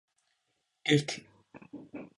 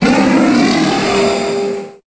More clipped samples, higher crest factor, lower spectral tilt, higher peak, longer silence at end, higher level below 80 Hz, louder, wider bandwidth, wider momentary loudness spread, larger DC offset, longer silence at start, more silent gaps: neither; first, 24 dB vs 12 dB; about the same, -5 dB/octave vs -5 dB/octave; second, -12 dBFS vs 0 dBFS; about the same, 0.15 s vs 0.15 s; second, -74 dBFS vs -42 dBFS; second, -30 LUFS vs -13 LUFS; first, 11.5 kHz vs 8 kHz; first, 22 LU vs 9 LU; neither; first, 0.85 s vs 0 s; neither